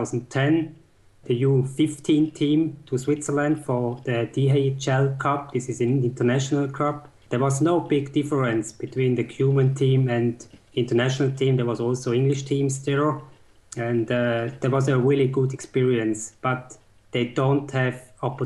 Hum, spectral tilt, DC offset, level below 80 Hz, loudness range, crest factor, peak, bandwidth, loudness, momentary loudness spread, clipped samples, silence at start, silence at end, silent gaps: none; -6.5 dB/octave; under 0.1%; -60 dBFS; 1 LU; 12 dB; -10 dBFS; 11.5 kHz; -23 LUFS; 7 LU; under 0.1%; 0 s; 0 s; none